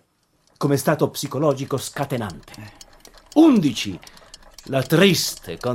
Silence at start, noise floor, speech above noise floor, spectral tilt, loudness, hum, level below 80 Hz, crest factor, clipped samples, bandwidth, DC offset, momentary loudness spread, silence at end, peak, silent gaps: 0.6 s; -63 dBFS; 44 dB; -5 dB/octave; -20 LUFS; none; -54 dBFS; 18 dB; under 0.1%; 16.5 kHz; under 0.1%; 21 LU; 0 s; -2 dBFS; none